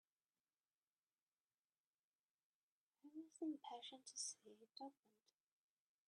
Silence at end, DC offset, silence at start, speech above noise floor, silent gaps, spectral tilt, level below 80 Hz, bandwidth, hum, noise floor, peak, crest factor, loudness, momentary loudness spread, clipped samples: 1.15 s; under 0.1%; 3.05 s; over 35 dB; none; -1 dB/octave; under -90 dBFS; 10 kHz; none; under -90 dBFS; -38 dBFS; 22 dB; -54 LUFS; 12 LU; under 0.1%